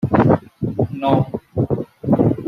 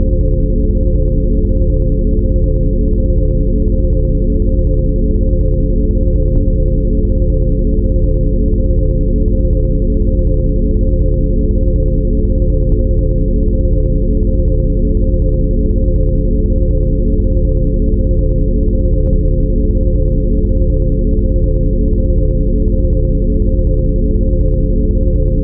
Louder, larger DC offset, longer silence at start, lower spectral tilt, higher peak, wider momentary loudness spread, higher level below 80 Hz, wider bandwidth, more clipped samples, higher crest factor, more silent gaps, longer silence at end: second, -19 LUFS vs -15 LUFS; neither; about the same, 0 s vs 0 s; second, -10.5 dB/octave vs -18.5 dB/octave; about the same, -2 dBFS vs 0 dBFS; first, 9 LU vs 1 LU; second, -44 dBFS vs -12 dBFS; first, 5.8 kHz vs 0.8 kHz; neither; first, 16 dB vs 10 dB; neither; about the same, 0 s vs 0 s